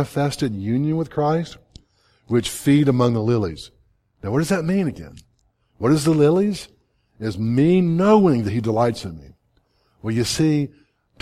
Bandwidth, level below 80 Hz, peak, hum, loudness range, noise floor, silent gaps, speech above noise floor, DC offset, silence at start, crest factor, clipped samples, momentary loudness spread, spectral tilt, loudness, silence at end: 15.5 kHz; -50 dBFS; -4 dBFS; none; 3 LU; -64 dBFS; none; 45 dB; under 0.1%; 0 s; 16 dB; under 0.1%; 15 LU; -6.5 dB/octave; -20 LUFS; 0.55 s